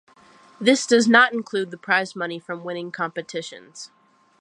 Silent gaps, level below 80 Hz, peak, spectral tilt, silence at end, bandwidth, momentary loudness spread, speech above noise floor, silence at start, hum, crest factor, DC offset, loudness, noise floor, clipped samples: none; -78 dBFS; -2 dBFS; -3 dB/octave; 0.55 s; 11 kHz; 22 LU; 30 dB; 0.6 s; none; 22 dB; under 0.1%; -21 LUFS; -52 dBFS; under 0.1%